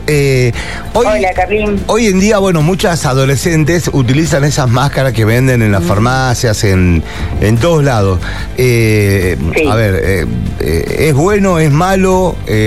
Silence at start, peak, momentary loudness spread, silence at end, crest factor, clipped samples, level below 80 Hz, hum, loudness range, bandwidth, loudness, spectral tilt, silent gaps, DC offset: 0 s; 0 dBFS; 5 LU; 0 s; 10 dB; under 0.1%; -24 dBFS; none; 1 LU; 14 kHz; -11 LUFS; -6 dB/octave; none; 3%